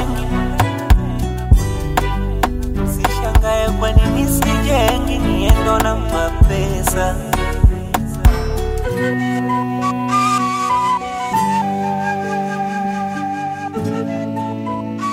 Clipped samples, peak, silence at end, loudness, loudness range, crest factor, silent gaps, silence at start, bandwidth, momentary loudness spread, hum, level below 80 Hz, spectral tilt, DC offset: under 0.1%; 0 dBFS; 0 s; -18 LUFS; 4 LU; 16 dB; none; 0 s; 16 kHz; 7 LU; none; -20 dBFS; -5.5 dB/octave; under 0.1%